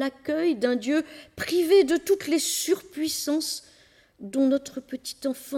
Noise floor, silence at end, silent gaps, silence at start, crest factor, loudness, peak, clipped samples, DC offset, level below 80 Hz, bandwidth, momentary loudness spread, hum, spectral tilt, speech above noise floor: -58 dBFS; 0 s; none; 0 s; 16 dB; -25 LUFS; -8 dBFS; under 0.1%; under 0.1%; -64 dBFS; 18.5 kHz; 15 LU; none; -2.5 dB/octave; 32 dB